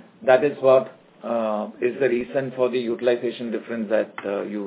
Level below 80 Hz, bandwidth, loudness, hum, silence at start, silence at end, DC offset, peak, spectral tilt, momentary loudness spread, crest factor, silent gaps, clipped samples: -68 dBFS; 4 kHz; -23 LUFS; none; 0.2 s; 0 s; under 0.1%; -2 dBFS; -10 dB/octave; 10 LU; 20 dB; none; under 0.1%